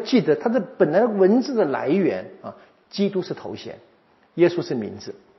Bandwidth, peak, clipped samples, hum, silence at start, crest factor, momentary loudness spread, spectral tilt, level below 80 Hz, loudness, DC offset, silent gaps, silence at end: 6.2 kHz; -4 dBFS; under 0.1%; none; 0 s; 18 dB; 19 LU; -5.5 dB/octave; -72 dBFS; -21 LUFS; under 0.1%; none; 0.25 s